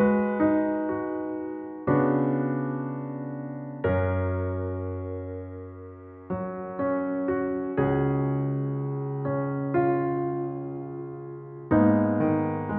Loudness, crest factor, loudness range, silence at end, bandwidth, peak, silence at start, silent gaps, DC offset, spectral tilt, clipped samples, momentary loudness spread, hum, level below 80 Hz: -27 LUFS; 16 dB; 5 LU; 0 s; 3.7 kHz; -10 dBFS; 0 s; none; under 0.1%; -9.5 dB/octave; under 0.1%; 14 LU; none; -54 dBFS